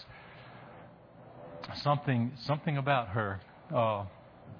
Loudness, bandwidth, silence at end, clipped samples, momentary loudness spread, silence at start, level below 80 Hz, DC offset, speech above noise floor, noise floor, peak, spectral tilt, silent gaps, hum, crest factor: -32 LUFS; 5.4 kHz; 0 s; under 0.1%; 22 LU; 0 s; -66 dBFS; under 0.1%; 22 dB; -54 dBFS; -14 dBFS; -8 dB/octave; none; none; 22 dB